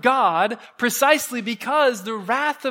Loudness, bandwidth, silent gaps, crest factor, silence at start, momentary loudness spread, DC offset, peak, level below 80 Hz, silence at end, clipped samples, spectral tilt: -20 LUFS; 16.5 kHz; none; 20 dB; 0.05 s; 8 LU; under 0.1%; 0 dBFS; -74 dBFS; 0 s; under 0.1%; -2.5 dB/octave